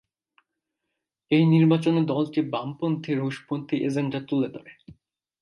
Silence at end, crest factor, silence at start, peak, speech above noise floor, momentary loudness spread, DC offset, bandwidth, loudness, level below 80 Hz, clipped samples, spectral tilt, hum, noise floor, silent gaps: 0.5 s; 16 dB; 1.3 s; -10 dBFS; 59 dB; 11 LU; under 0.1%; 11.5 kHz; -24 LUFS; -70 dBFS; under 0.1%; -8 dB/octave; none; -83 dBFS; none